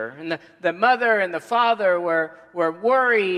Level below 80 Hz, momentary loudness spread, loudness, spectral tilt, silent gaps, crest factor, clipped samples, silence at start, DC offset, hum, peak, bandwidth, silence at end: -78 dBFS; 11 LU; -21 LUFS; -5 dB/octave; none; 18 dB; under 0.1%; 0 s; under 0.1%; none; -4 dBFS; 12 kHz; 0 s